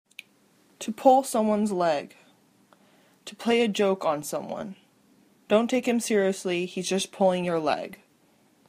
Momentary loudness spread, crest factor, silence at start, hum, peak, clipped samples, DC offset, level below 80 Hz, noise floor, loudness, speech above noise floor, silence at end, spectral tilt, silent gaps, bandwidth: 18 LU; 22 dB; 0.8 s; none; -6 dBFS; under 0.1%; under 0.1%; -72 dBFS; -63 dBFS; -25 LUFS; 38 dB; 0.75 s; -4.5 dB/octave; none; 15.5 kHz